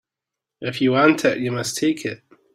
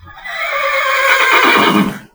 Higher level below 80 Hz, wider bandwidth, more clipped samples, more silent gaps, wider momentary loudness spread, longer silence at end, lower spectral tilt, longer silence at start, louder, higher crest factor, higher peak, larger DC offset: second, -64 dBFS vs -48 dBFS; second, 16 kHz vs over 20 kHz; second, under 0.1% vs 0.1%; neither; first, 15 LU vs 11 LU; first, 0.4 s vs 0.15 s; about the same, -4.5 dB/octave vs -3.5 dB/octave; first, 0.6 s vs 0.05 s; second, -20 LUFS vs -11 LUFS; first, 20 dB vs 14 dB; about the same, -2 dBFS vs 0 dBFS; neither